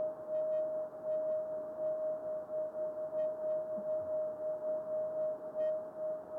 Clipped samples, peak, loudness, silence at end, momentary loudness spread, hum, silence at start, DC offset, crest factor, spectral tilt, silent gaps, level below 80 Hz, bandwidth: under 0.1%; -28 dBFS; -38 LUFS; 0 s; 4 LU; none; 0 s; under 0.1%; 10 dB; -8 dB/octave; none; -82 dBFS; 3.3 kHz